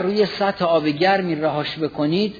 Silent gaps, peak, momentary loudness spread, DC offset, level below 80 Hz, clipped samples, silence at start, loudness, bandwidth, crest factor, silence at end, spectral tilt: none; -4 dBFS; 5 LU; under 0.1%; -58 dBFS; under 0.1%; 0 s; -20 LUFS; 5 kHz; 16 dB; 0 s; -7 dB/octave